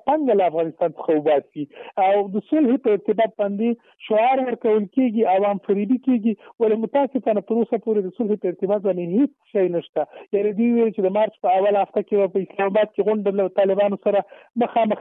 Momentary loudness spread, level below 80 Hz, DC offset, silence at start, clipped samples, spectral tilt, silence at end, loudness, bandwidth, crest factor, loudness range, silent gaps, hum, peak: 5 LU; -72 dBFS; under 0.1%; 0.05 s; under 0.1%; -11 dB/octave; 0 s; -21 LUFS; 3.9 kHz; 12 dB; 2 LU; 9.89-9.93 s; none; -8 dBFS